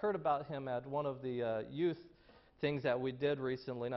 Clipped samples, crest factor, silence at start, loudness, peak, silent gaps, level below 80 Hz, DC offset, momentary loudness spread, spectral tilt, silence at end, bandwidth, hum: under 0.1%; 16 dB; 0 s; -38 LUFS; -22 dBFS; none; -72 dBFS; under 0.1%; 5 LU; -5.5 dB/octave; 0 s; 6 kHz; none